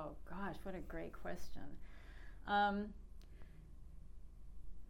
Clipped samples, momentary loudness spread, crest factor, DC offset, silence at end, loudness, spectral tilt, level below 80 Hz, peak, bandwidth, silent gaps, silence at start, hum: under 0.1%; 24 LU; 18 dB; under 0.1%; 0 s; -43 LUFS; -6 dB/octave; -56 dBFS; -24 dBFS; 16 kHz; none; 0 s; 60 Hz at -60 dBFS